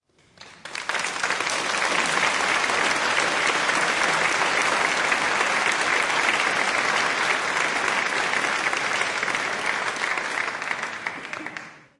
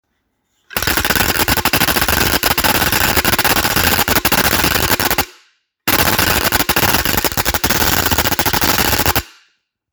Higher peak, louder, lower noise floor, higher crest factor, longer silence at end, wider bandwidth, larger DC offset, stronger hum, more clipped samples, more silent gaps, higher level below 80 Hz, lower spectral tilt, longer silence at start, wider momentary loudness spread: second, -6 dBFS vs 0 dBFS; second, -22 LUFS vs -13 LUFS; second, -50 dBFS vs -67 dBFS; about the same, 18 dB vs 16 dB; second, 0.2 s vs 0.65 s; second, 11.5 kHz vs over 20 kHz; neither; neither; neither; neither; second, -64 dBFS vs -30 dBFS; second, -1 dB/octave vs -2.5 dB/octave; second, 0.4 s vs 0.7 s; first, 7 LU vs 4 LU